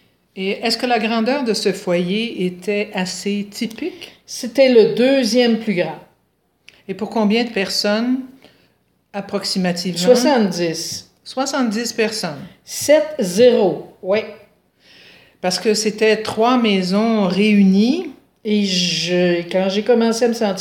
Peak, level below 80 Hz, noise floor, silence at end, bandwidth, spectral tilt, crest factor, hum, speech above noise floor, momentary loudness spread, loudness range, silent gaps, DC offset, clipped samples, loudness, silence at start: 0 dBFS; -64 dBFS; -64 dBFS; 0 s; 17 kHz; -4.5 dB/octave; 18 dB; none; 47 dB; 14 LU; 5 LU; none; under 0.1%; under 0.1%; -17 LUFS; 0.35 s